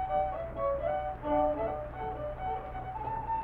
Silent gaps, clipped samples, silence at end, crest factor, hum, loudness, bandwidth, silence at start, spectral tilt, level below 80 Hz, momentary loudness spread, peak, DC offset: none; under 0.1%; 0 s; 16 dB; none; -34 LUFS; 4.2 kHz; 0 s; -9 dB/octave; -46 dBFS; 8 LU; -18 dBFS; under 0.1%